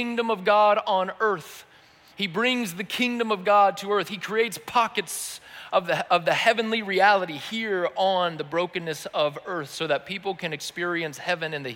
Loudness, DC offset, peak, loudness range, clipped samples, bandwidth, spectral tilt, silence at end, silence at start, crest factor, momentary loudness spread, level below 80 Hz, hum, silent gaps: -24 LUFS; under 0.1%; -8 dBFS; 4 LU; under 0.1%; 17 kHz; -3.5 dB/octave; 0 s; 0 s; 16 dB; 11 LU; -72 dBFS; none; none